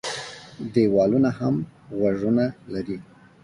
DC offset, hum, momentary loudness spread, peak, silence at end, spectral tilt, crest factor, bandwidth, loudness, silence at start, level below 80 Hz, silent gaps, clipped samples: under 0.1%; none; 15 LU; -6 dBFS; 0.4 s; -7 dB/octave; 16 dB; 11.5 kHz; -23 LUFS; 0.05 s; -56 dBFS; none; under 0.1%